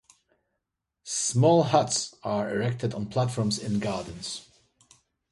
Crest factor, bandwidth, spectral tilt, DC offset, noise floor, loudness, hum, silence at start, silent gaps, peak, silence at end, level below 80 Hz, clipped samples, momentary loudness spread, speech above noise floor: 22 dB; 11.5 kHz; -5 dB/octave; under 0.1%; -83 dBFS; -26 LUFS; none; 1.05 s; none; -6 dBFS; 0.9 s; -60 dBFS; under 0.1%; 14 LU; 58 dB